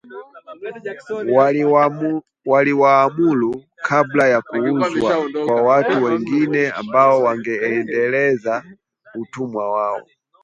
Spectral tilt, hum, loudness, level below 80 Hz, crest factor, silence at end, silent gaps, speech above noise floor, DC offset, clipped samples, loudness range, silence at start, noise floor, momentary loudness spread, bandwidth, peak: -7 dB/octave; none; -17 LUFS; -62 dBFS; 16 dB; 0.45 s; none; 20 dB; under 0.1%; under 0.1%; 2 LU; 0.1 s; -38 dBFS; 16 LU; 7.8 kHz; 0 dBFS